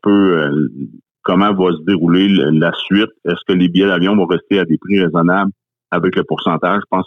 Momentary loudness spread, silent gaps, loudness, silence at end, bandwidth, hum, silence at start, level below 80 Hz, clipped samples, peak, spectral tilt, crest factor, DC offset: 7 LU; 1.11-1.15 s; -14 LUFS; 0 s; 6 kHz; none; 0.05 s; -54 dBFS; under 0.1%; -4 dBFS; -8.5 dB/octave; 10 dB; under 0.1%